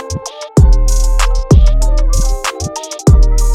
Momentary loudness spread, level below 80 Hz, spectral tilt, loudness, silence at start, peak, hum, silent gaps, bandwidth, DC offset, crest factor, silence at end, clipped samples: 11 LU; -10 dBFS; -5.5 dB/octave; -13 LUFS; 0 s; 0 dBFS; none; none; 13.5 kHz; under 0.1%; 8 dB; 0 s; under 0.1%